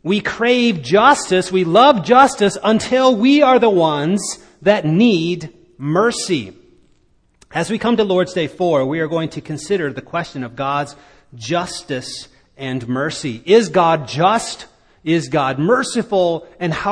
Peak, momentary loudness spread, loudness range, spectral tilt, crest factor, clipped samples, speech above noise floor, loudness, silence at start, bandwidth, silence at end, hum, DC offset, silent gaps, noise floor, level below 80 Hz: 0 dBFS; 14 LU; 10 LU; -5 dB/octave; 16 dB; under 0.1%; 41 dB; -16 LUFS; 0.05 s; 10.5 kHz; 0 s; none; under 0.1%; none; -56 dBFS; -52 dBFS